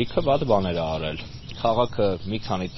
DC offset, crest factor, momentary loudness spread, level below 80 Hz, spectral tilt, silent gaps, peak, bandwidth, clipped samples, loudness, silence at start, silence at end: under 0.1%; 18 dB; 9 LU; -42 dBFS; -5 dB/octave; none; -6 dBFS; 6.2 kHz; under 0.1%; -24 LUFS; 0 s; 0 s